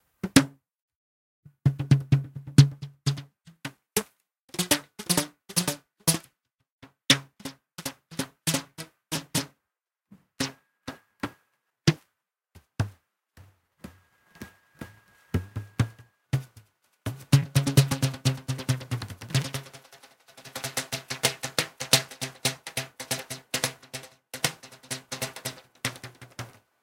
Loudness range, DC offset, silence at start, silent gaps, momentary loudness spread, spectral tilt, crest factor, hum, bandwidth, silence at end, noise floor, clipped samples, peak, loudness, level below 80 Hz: 9 LU; under 0.1%; 0.25 s; 0.82-0.89 s, 0.96-1.43 s, 4.44-4.48 s, 6.72-6.79 s; 20 LU; -4 dB/octave; 30 dB; none; 17 kHz; 0.35 s; -86 dBFS; under 0.1%; 0 dBFS; -28 LUFS; -56 dBFS